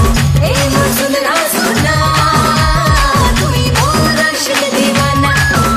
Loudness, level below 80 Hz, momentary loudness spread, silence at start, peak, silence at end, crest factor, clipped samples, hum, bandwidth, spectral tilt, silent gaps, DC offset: -11 LUFS; -20 dBFS; 2 LU; 0 s; 0 dBFS; 0 s; 10 dB; under 0.1%; none; 15.5 kHz; -4 dB/octave; none; under 0.1%